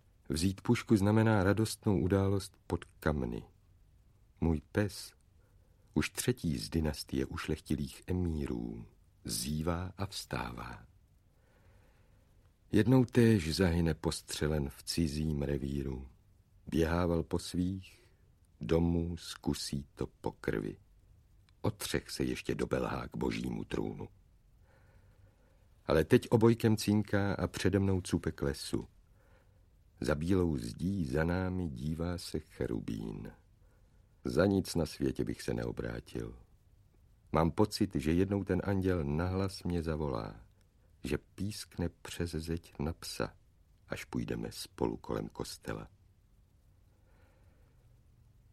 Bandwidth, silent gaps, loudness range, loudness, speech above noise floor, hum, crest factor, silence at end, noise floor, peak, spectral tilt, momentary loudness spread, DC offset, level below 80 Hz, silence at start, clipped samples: 15.5 kHz; none; 9 LU; -34 LUFS; 33 dB; none; 22 dB; 2.65 s; -66 dBFS; -12 dBFS; -6 dB/octave; 13 LU; under 0.1%; -50 dBFS; 0.3 s; under 0.1%